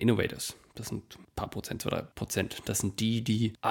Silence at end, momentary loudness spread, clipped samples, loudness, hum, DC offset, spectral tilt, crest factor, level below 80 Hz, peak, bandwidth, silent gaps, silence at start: 0 s; 11 LU; under 0.1%; -33 LUFS; none; under 0.1%; -4.5 dB/octave; 20 dB; -54 dBFS; -12 dBFS; 17 kHz; none; 0 s